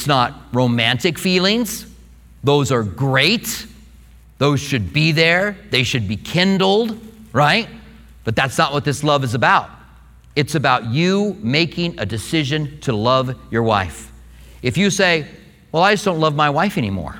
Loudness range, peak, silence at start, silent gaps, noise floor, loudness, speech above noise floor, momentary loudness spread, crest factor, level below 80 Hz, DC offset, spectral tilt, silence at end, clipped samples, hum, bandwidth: 2 LU; 0 dBFS; 0 s; none; -45 dBFS; -17 LUFS; 27 dB; 10 LU; 18 dB; -44 dBFS; under 0.1%; -5 dB/octave; 0 s; under 0.1%; none; 19.5 kHz